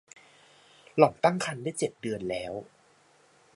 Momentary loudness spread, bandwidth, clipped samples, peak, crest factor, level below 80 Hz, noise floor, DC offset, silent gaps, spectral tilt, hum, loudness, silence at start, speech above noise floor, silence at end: 13 LU; 11.5 kHz; under 0.1%; -6 dBFS; 26 dB; -66 dBFS; -62 dBFS; under 0.1%; none; -5 dB/octave; none; -28 LUFS; 0.95 s; 34 dB; 0.9 s